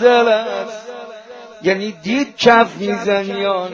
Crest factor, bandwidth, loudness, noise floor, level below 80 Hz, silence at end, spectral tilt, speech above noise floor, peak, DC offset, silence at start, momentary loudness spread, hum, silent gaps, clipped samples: 16 dB; 7.4 kHz; -16 LUFS; -36 dBFS; -58 dBFS; 0 s; -4.5 dB/octave; 21 dB; 0 dBFS; under 0.1%; 0 s; 21 LU; none; none; under 0.1%